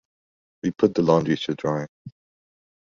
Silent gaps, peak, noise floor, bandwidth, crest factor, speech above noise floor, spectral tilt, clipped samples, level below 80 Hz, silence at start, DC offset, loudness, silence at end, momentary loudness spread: 1.89-2.05 s; -4 dBFS; under -90 dBFS; 7.4 kHz; 22 dB; over 68 dB; -7 dB/octave; under 0.1%; -58 dBFS; 0.65 s; under 0.1%; -23 LUFS; 0.9 s; 11 LU